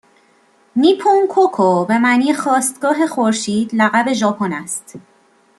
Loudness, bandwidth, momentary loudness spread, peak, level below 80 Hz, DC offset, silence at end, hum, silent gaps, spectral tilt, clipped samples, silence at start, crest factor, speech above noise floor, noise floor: -15 LUFS; 12.5 kHz; 8 LU; -2 dBFS; -64 dBFS; under 0.1%; 0.6 s; none; none; -4 dB/octave; under 0.1%; 0.75 s; 14 dB; 39 dB; -54 dBFS